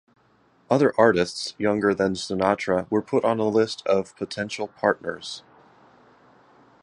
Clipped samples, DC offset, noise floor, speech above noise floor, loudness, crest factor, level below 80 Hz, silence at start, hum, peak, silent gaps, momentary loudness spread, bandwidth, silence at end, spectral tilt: under 0.1%; under 0.1%; -61 dBFS; 38 dB; -23 LUFS; 22 dB; -58 dBFS; 0.7 s; none; -2 dBFS; none; 11 LU; 11 kHz; 1.45 s; -5 dB/octave